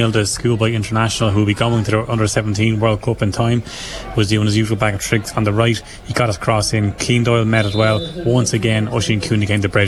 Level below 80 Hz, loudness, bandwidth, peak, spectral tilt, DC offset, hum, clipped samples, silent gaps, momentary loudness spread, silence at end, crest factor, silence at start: -38 dBFS; -17 LUFS; 12.5 kHz; -2 dBFS; -5 dB/octave; under 0.1%; none; under 0.1%; none; 4 LU; 0 s; 14 dB; 0 s